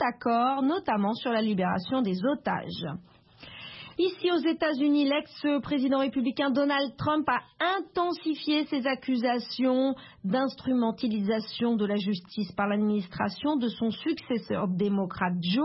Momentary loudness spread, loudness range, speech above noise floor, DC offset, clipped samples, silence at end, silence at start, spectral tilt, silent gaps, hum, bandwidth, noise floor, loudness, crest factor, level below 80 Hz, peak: 6 LU; 3 LU; 20 dB; under 0.1%; under 0.1%; 0 s; 0 s; -10 dB/octave; none; none; 5.8 kHz; -47 dBFS; -28 LUFS; 16 dB; -64 dBFS; -12 dBFS